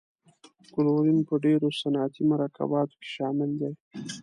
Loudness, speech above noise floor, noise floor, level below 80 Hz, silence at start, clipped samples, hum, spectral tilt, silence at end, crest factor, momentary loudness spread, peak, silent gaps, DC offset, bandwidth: -27 LUFS; 32 dB; -58 dBFS; -72 dBFS; 0.75 s; under 0.1%; none; -7 dB/octave; 0 s; 14 dB; 10 LU; -14 dBFS; 3.80-3.91 s; under 0.1%; 10.5 kHz